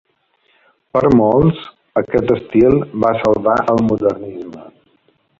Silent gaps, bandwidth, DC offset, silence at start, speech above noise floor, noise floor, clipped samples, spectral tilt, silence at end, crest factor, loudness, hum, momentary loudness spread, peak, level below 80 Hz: none; 7.4 kHz; under 0.1%; 0.95 s; 46 dB; -60 dBFS; under 0.1%; -9 dB/octave; 0.75 s; 16 dB; -15 LUFS; none; 15 LU; 0 dBFS; -42 dBFS